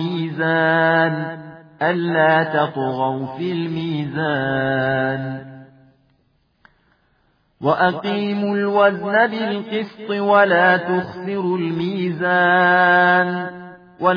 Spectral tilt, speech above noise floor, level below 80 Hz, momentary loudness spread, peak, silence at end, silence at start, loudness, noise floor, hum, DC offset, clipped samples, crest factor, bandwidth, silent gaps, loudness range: -8.5 dB/octave; 45 dB; -62 dBFS; 12 LU; -2 dBFS; 0 s; 0 s; -18 LUFS; -63 dBFS; none; under 0.1%; under 0.1%; 16 dB; 5.2 kHz; none; 8 LU